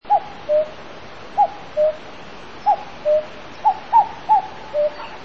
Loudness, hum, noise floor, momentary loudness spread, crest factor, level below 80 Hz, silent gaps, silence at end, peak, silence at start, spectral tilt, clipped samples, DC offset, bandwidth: -20 LUFS; none; -38 dBFS; 20 LU; 18 dB; -54 dBFS; none; 0 s; -4 dBFS; 0 s; -5 dB/octave; under 0.1%; 1%; 7 kHz